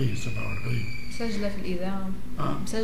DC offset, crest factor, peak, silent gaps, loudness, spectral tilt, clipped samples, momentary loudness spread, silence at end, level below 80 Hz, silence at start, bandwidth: 5%; 14 dB; -14 dBFS; none; -32 LUFS; -6 dB/octave; under 0.1%; 4 LU; 0 s; -40 dBFS; 0 s; 15.5 kHz